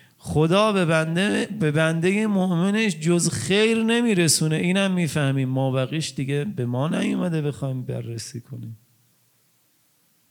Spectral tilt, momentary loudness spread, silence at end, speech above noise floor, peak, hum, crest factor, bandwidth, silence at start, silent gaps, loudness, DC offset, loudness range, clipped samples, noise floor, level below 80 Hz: -5 dB/octave; 11 LU; 1.55 s; 42 dB; -4 dBFS; none; 18 dB; 19 kHz; 0.25 s; none; -22 LUFS; under 0.1%; 8 LU; under 0.1%; -63 dBFS; -62 dBFS